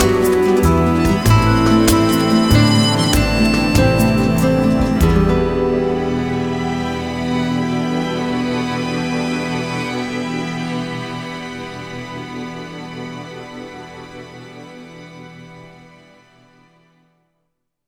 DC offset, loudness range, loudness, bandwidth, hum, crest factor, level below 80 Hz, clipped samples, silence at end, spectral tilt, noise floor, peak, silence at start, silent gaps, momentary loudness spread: under 0.1%; 19 LU; -16 LUFS; over 20 kHz; none; 16 dB; -30 dBFS; under 0.1%; 2.15 s; -6 dB/octave; -71 dBFS; 0 dBFS; 0 s; none; 21 LU